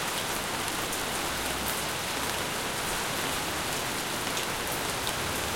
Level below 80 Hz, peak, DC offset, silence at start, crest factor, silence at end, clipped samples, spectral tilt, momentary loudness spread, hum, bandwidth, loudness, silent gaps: -50 dBFS; -12 dBFS; 0.2%; 0 s; 20 dB; 0 s; under 0.1%; -2 dB/octave; 1 LU; none; 17 kHz; -29 LUFS; none